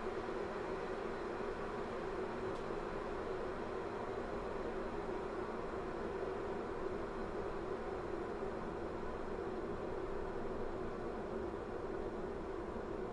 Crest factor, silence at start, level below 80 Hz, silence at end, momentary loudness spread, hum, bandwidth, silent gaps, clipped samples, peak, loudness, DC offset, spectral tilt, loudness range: 14 dB; 0 s; -52 dBFS; 0 s; 2 LU; none; 11 kHz; none; under 0.1%; -28 dBFS; -43 LUFS; under 0.1%; -7 dB/octave; 1 LU